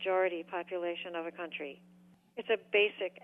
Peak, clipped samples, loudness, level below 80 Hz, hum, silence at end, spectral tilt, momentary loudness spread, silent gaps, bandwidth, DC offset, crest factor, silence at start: -16 dBFS; under 0.1%; -34 LUFS; -86 dBFS; none; 0.05 s; -5.5 dB/octave; 15 LU; none; 3.9 kHz; under 0.1%; 18 dB; 0 s